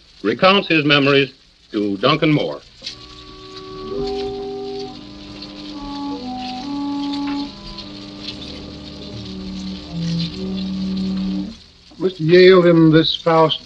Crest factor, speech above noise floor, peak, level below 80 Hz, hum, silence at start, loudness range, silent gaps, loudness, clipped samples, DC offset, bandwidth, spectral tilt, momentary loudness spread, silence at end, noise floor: 18 dB; 27 dB; 0 dBFS; -44 dBFS; none; 0.25 s; 13 LU; none; -17 LUFS; under 0.1%; under 0.1%; 8 kHz; -6.5 dB/octave; 20 LU; 0 s; -41 dBFS